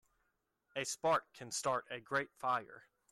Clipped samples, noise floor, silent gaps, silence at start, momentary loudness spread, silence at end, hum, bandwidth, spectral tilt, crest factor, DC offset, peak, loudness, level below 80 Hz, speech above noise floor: under 0.1%; -83 dBFS; none; 0.75 s; 8 LU; 0.3 s; none; 14 kHz; -2.5 dB/octave; 18 dB; under 0.1%; -22 dBFS; -38 LUFS; -80 dBFS; 44 dB